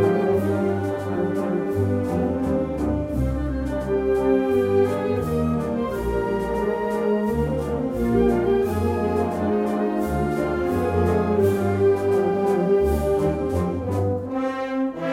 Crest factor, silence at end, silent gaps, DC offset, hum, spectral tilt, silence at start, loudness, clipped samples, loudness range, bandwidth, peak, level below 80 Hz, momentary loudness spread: 14 dB; 0 s; none; under 0.1%; none; -8 dB/octave; 0 s; -22 LUFS; under 0.1%; 3 LU; 16 kHz; -8 dBFS; -36 dBFS; 5 LU